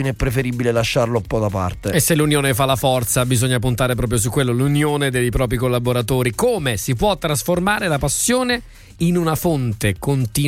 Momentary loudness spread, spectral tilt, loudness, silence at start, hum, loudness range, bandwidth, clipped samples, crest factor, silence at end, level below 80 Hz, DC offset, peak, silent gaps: 4 LU; -5 dB/octave; -18 LUFS; 0 s; none; 1 LU; 16.5 kHz; under 0.1%; 16 dB; 0 s; -34 dBFS; under 0.1%; -2 dBFS; none